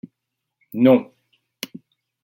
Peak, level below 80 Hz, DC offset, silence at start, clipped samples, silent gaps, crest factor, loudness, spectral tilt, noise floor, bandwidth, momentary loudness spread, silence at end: -4 dBFS; -70 dBFS; under 0.1%; 0.75 s; under 0.1%; none; 20 dB; -17 LUFS; -6.5 dB/octave; -80 dBFS; 16.5 kHz; 19 LU; 1.2 s